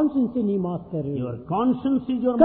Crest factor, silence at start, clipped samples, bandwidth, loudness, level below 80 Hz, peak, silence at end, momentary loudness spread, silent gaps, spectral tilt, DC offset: 18 dB; 0 s; under 0.1%; 4 kHz; -25 LUFS; -56 dBFS; -4 dBFS; 0 s; 7 LU; none; -12.5 dB/octave; under 0.1%